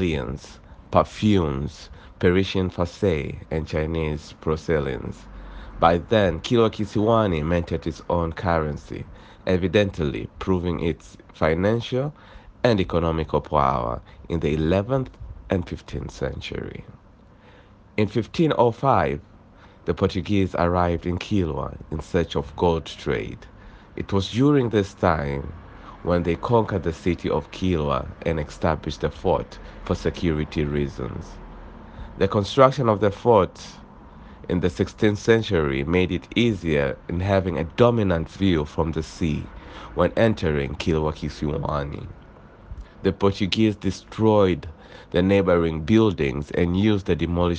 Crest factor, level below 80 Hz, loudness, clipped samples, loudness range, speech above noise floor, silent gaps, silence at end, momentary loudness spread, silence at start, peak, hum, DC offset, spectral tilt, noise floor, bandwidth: 22 dB; -42 dBFS; -23 LUFS; under 0.1%; 5 LU; 28 dB; none; 0 s; 15 LU; 0 s; 0 dBFS; none; under 0.1%; -7 dB/octave; -50 dBFS; 9 kHz